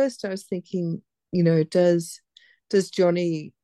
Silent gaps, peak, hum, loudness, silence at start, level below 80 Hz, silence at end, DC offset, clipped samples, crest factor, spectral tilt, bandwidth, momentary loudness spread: none; -8 dBFS; none; -24 LUFS; 0 s; -72 dBFS; 0.15 s; under 0.1%; under 0.1%; 16 dB; -6.5 dB/octave; 12.5 kHz; 12 LU